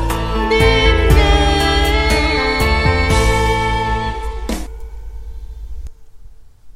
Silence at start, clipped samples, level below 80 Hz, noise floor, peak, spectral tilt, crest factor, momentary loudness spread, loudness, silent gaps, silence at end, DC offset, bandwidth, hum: 0 s; under 0.1%; -20 dBFS; -37 dBFS; 0 dBFS; -5 dB/octave; 16 dB; 22 LU; -15 LUFS; none; 0.05 s; under 0.1%; 15.5 kHz; none